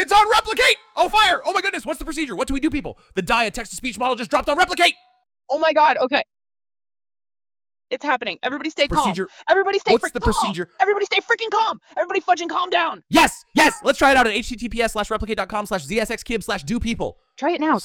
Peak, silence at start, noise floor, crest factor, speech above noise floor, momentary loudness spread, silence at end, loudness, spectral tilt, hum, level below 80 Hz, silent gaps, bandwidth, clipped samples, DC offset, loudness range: 0 dBFS; 0 s; under -90 dBFS; 20 dB; over 70 dB; 11 LU; 0 s; -20 LUFS; -3 dB/octave; none; -40 dBFS; none; 20 kHz; under 0.1%; under 0.1%; 5 LU